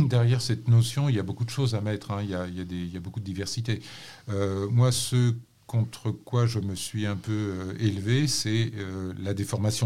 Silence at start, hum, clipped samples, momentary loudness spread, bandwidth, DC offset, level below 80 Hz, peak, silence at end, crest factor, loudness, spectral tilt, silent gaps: 0 s; none; under 0.1%; 11 LU; 14.5 kHz; 0.2%; -58 dBFS; -10 dBFS; 0 s; 16 dB; -28 LUFS; -5.5 dB/octave; none